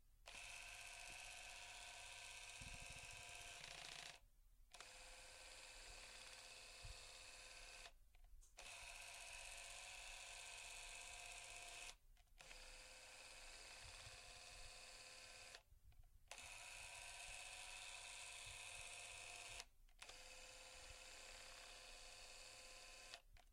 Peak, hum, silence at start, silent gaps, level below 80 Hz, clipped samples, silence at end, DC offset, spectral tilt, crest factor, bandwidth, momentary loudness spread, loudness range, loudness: -32 dBFS; none; 0 s; none; -70 dBFS; under 0.1%; 0 s; under 0.1%; 0 dB/octave; 26 dB; 16 kHz; 6 LU; 4 LU; -57 LUFS